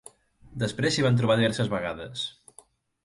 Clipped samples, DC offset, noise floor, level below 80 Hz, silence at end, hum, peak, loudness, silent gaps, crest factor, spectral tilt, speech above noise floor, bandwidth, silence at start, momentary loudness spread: under 0.1%; under 0.1%; -57 dBFS; -56 dBFS; 0.75 s; none; -8 dBFS; -26 LUFS; none; 18 dB; -5.5 dB/octave; 32 dB; 11.5 kHz; 0.45 s; 12 LU